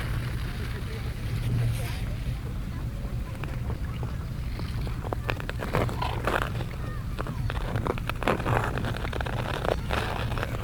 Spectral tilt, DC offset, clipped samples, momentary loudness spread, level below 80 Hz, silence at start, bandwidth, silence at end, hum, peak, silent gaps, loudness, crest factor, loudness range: -6 dB/octave; under 0.1%; under 0.1%; 7 LU; -34 dBFS; 0 s; 20 kHz; 0 s; none; -6 dBFS; none; -31 LUFS; 24 dB; 4 LU